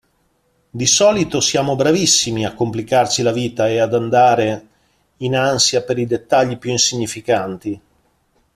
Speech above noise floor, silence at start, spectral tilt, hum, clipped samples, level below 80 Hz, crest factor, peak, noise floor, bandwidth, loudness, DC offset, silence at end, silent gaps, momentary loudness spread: 46 dB; 0.75 s; -3.5 dB/octave; none; under 0.1%; -52 dBFS; 18 dB; 0 dBFS; -62 dBFS; 14.5 kHz; -16 LUFS; under 0.1%; 0.75 s; none; 10 LU